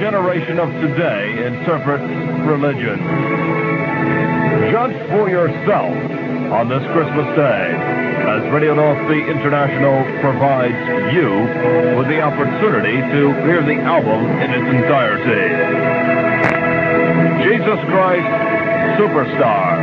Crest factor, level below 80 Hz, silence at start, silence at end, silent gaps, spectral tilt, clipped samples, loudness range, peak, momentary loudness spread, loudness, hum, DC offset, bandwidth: 16 dB; -54 dBFS; 0 s; 0 s; none; -9 dB/octave; under 0.1%; 3 LU; 0 dBFS; 4 LU; -15 LUFS; none; under 0.1%; 6.8 kHz